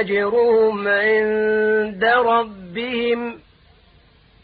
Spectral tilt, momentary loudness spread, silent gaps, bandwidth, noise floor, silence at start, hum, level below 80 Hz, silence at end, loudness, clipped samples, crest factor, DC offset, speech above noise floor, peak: -9.5 dB/octave; 9 LU; none; 4.8 kHz; -52 dBFS; 0 s; none; -54 dBFS; 1.05 s; -18 LUFS; under 0.1%; 14 dB; under 0.1%; 34 dB; -6 dBFS